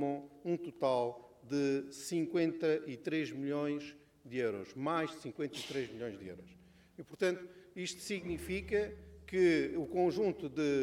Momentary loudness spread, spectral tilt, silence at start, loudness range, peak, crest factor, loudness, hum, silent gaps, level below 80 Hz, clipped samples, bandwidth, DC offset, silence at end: 12 LU; -5.5 dB/octave; 0 s; 5 LU; -20 dBFS; 16 dB; -36 LUFS; none; none; -62 dBFS; under 0.1%; 15.5 kHz; under 0.1%; 0 s